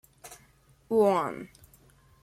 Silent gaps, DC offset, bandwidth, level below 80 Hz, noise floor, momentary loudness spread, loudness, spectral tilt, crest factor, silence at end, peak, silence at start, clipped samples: none; under 0.1%; 15.5 kHz; -66 dBFS; -61 dBFS; 25 LU; -26 LUFS; -6 dB/octave; 18 dB; 0.75 s; -12 dBFS; 0.25 s; under 0.1%